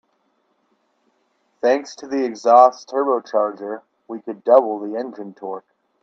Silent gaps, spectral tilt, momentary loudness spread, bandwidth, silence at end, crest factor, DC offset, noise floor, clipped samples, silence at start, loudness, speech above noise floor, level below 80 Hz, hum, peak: none; -4.5 dB/octave; 20 LU; 7.6 kHz; 0.45 s; 20 dB; under 0.1%; -66 dBFS; under 0.1%; 1.65 s; -18 LUFS; 48 dB; -76 dBFS; none; 0 dBFS